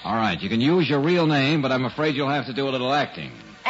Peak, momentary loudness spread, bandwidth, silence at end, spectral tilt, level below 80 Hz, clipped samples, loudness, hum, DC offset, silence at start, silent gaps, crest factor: -10 dBFS; 6 LU; 8 kHz; 0 s; -6.5 dB/octave; -58 dBFS; under 0.1%; -22 LUFS; none; under 0.1%; 0 s; none; 12 dB